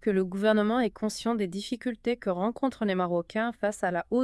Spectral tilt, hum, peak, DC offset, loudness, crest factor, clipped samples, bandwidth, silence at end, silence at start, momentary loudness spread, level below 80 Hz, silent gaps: -6 dB/octave; none; -12 dBFS; under 0.1%; -29 LUFS; 16 dB; under 0.1%; 12 kHz; 0 s; 0 s; 7 LU; -60 dBFS; none